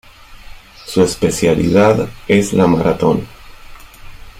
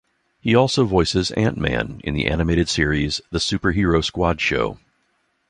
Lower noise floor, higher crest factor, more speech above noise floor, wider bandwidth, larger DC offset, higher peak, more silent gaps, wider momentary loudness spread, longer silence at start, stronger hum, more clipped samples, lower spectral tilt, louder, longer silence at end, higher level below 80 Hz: second, -35 dBFS vs -67 dBFS; about the same, 14 dB vs 18 dB; second, 22 dB vs 48 dB; first, 16 kHz vs 11 kHz; neither; about the same, -2 dBFS vs -2 dBFS; neither; first, 9 LU vs 6 LU; second, 0.3 s vs 0.45 s; neither; neither; about the same, -6 dB/octave vs -5 dB/octave; first, -14 LUFS vs -20 LUFS; second, 0 s vs 0.75 s; about the same, -38 dBFS vs -34 dBFS